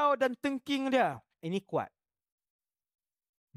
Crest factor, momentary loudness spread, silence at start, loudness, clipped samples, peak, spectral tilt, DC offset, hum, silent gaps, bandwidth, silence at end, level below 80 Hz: 20 dB; 10 LU; 0 s; -32 LUFS; under 0.1%; -14 dBFS; -5.5 dB/octave; under 0.1%; none; none; 14 kHz; 1.7 s; -78 dBFS